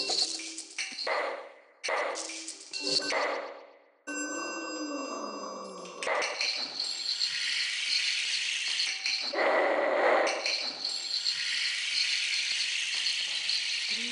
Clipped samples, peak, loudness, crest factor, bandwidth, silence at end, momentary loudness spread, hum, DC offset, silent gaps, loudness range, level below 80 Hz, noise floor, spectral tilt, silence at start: under 0.1%; -14 dBFS; -29 LUFS; 18 dB; 10.5 kHz; 0 s; 11 LU; none; under 0.1%; none; 6 LU; under -90 dBFS; -54 dBFS; 0.5 dB/octave; 0 s